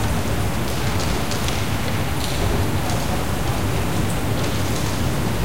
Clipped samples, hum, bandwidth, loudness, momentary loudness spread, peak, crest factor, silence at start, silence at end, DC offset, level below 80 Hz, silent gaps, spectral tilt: under 0.1%; none; 17 kHz; -23 LUFS; 1 LU; -6 dBFS; 16 dB; 0 s; 0 s; 5%; -30 dBFS; none; -5 dB/octave